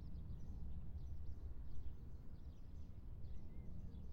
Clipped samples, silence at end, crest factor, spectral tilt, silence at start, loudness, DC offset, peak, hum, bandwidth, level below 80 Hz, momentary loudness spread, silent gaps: under 0.1%; 0 s; 12 dB; -9 dB/octave; 0 s; -55 LUFS; under 0.1%; -34 dBFS; none; 5.2 kHz; -52 dBFS; 4 LU; none